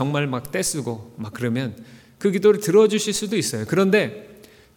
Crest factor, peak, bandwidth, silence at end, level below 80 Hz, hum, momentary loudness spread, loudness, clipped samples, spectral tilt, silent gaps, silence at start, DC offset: 16 dB; -6 dBFS; 18.5 kHz; 0.4 s; -58 dBFS; none; 15 LU; -21 LUFS; under 0.1%; -4.5 dB/octave; none; 0 s; under 0.1%